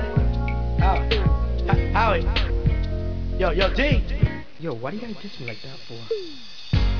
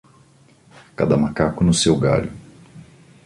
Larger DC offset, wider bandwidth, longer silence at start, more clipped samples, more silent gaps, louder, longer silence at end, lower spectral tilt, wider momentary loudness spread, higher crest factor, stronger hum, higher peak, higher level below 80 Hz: first, 2% vs under 0.1%; second, 5.4 kHz vs 11.5 kHz; second, 0 s vs 1 s; neither; neither; second, -24 LUFS vs -18 LUFS; second, 0 s vs 0.45 s; first, -7.5 dB/octave vs -5.5 dB/octave; first, 14 LU vs 11 LU; about the same, 18 dB vs 18 dB; neither; about the same, -6 dBFS vs -4 dBFS; first, -26 dBFS vs -42 dBFS